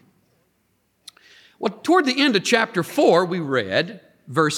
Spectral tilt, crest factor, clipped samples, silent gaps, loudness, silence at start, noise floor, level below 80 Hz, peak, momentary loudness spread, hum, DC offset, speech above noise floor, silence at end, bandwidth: -4.5 dB/octave; 18 dB; under 0.1%; none; -20 LUFS; 1.6 s; -67 dBFS; -74 dBFS; -4 dBFS; 10 LU; none; under 0.1%; 48 dB; 0 s; 17.5 kHz